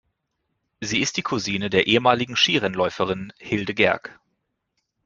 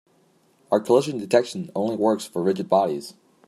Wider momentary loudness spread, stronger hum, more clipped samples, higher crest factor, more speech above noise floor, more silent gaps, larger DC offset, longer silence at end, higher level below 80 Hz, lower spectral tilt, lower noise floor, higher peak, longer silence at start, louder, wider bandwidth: about the same, 10 LU vs 8 LU; neither; neither; about the same, 22 dB vs 20 dB; first, 54 dB vs 39 dB; neither; neither; first, 0.95 s vs 0.35 s; first, -58 dBFS vs -72 dBFS; second, -3.5 dB/octave vs -6 dB/octave; first, -76 dBFS vs -61 dBFS; about the same, -2 dBFS vs -4 dBFS; about the same, 0.8 s vs 0.7 s; about the same, -21 LUFS vs -23 LUFS; second, 7.6 kHz vs 14.5 kHz